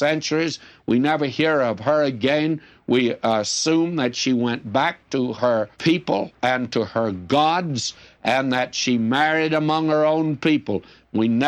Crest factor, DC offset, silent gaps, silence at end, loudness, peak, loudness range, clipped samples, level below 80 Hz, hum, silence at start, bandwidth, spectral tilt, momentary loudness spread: 14 dB; under 0.1%; none; 0 s; -21 LUFS; -8 dBFS; 1 LU; under 0.1%; -62 dBFS; none; 0 s; 9.4 kHz; -4.5 dB/octave; 6 LU